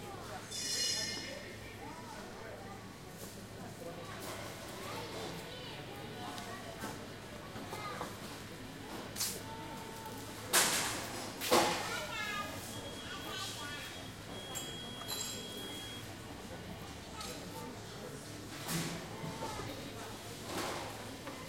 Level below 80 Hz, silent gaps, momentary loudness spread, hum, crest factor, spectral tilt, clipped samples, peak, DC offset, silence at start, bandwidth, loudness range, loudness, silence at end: -62 dBFS; none; 14 LU; none; 26 dB; -2.5 dB/octave; under 0.1%; -14 dBFS; under 0.1%; 0 s; 16.5 kHz; 11 LU; -40 LUFS; 0 s